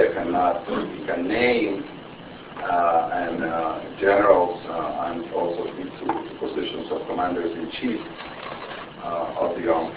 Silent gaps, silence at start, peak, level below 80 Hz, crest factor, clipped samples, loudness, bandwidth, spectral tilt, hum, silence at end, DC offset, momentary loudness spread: none; 0 s; -2 dBFS; -54 dBFS; 22 dB; under 0.1%; -24 LUFS; 4 kHz; -9 dB/octave; none; 0 s; under 0.1%; 14 LU